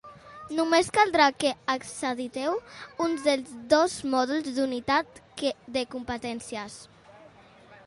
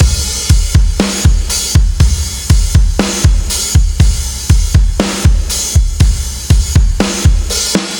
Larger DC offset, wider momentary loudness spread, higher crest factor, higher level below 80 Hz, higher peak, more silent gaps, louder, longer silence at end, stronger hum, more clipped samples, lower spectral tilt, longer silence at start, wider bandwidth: neither; first, 15 LU vs 3 LU; first, 22 dB vs 10 dB; second, -62 dBFS vs -12 dBFS; second, -6 dBFS vs 0 dBFS; neither; second, -27 LUFS vs -12 LUFS; about the same, 0.1 s vs 0 s; neither; neither; about the same, -3 dB/octave vs -4 dB/octave; about the same, 0.05 s vs 0 s; second, 11.5 kHz vs 20 kHz